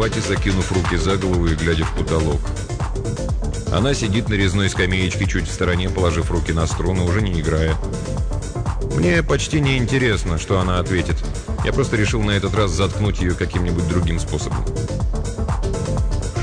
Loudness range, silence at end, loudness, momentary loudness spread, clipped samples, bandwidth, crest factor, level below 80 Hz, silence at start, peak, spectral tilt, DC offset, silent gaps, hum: 2 LU; 0 s; -20 LUFS; 6 LU; under 0.1%; 10 kHz; 14 dB; -26 dBFS; 0 s; -6 dBFS; -5.5 dB/octave; under 0.1%; none; none